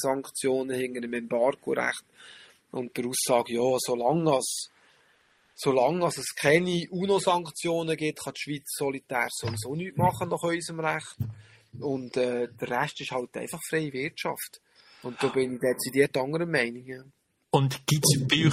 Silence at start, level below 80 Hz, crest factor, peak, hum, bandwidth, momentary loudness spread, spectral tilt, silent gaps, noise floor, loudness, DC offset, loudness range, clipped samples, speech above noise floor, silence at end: 0 s; -64 dBFS; 22 dB; -6 dBFS; none; 15.5 kHz; 12 LU; -4.5 dB/octave; none; -64 dBFS; -28 LUFS; under 0.1%; 5 LU; under 0.1%; 37 dB; 0 s